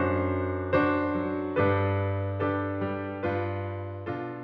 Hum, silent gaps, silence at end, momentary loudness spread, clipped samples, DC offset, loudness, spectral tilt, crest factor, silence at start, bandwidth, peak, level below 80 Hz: none; none; 0 s; 10 LU; under 0.1%; under 0.1%; -29 LUFS; -10.5 dB/octave; 16 dB; 0 s; 5 kHz; -12 dBFS; -58 dBFS